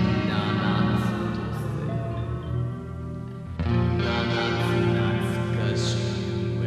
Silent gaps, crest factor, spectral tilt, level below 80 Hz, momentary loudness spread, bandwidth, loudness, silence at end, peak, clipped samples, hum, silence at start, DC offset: none; 14 dB; -6.5 dB/octave; -40 dBFS; 8 LU; 12.5 kHz; -26 LUFS; 0 s; -10 dBFS; under 0.1%; none; 0 s; under 0.1%